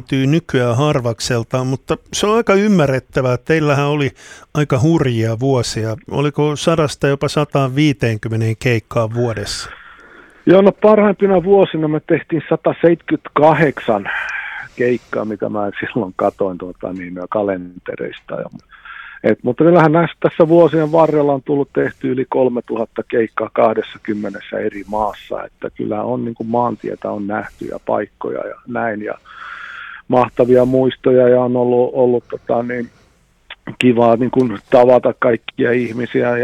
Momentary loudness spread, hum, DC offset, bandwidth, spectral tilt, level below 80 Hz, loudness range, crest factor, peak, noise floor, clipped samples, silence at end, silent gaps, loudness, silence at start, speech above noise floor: 14 LU; none; under 0.1%; 14 kHz; -6.5 dB/octave; -48 dBFS; 8 LU; 16 dB; 0 dBFS; -53 dBFS; under 0.1%; 0 s; none; -16 LUFS; 0.1 s; 38 dB